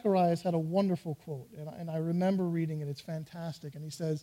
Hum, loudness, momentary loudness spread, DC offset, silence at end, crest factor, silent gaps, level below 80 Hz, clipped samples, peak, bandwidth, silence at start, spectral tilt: none; -33 LUFS; 13 LU; under 0.1%; 0 s; 14 dB; none; -70 dBFS; under 0.1%; -18 dBFS; 16 kHz; 0.05 s; -8 dB/octave